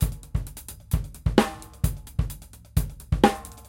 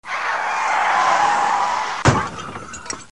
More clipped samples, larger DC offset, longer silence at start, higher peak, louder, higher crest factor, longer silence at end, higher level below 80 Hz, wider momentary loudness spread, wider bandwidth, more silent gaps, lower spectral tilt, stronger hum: neither; second, under 0.1% vs 0.6%; about the same, 0 s vs 0.05 s; about the same, -2 dBFS vs 0 dBFS; second, -27 LUFS vs -18 LUFS; about the same, 24 dB vs 20 dB; about the same, 0.05 s vs 0.05 s; first, -32 dBFS vs -42 dBFS; about the same, 12 LU vs 14 LU; first, 17 kHz vs 11.5 kHz; neither; first, -6 dB/octave vs -4 dB/octave; neither